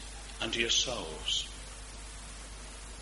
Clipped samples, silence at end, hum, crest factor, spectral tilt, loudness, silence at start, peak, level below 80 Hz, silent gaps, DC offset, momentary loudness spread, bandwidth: under 0.1%; 0 s; none; 22 dB; -1.5 dB/octave; -31 LUFS; 0 s; -14 dBFS; -48 dBFS; none; under 0.1%; 18 LU; 11.5 kHz